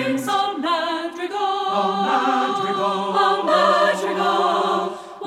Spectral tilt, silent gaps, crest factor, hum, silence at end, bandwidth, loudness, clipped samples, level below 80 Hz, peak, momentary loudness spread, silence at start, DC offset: -4 dB/octave; none; 16 dB; none; 0 s; 15.5 kHz; -20 LUFS; under 0.1%; -70 dBFS; -4 dBFS; 7 LU; 0 s; under 0.1%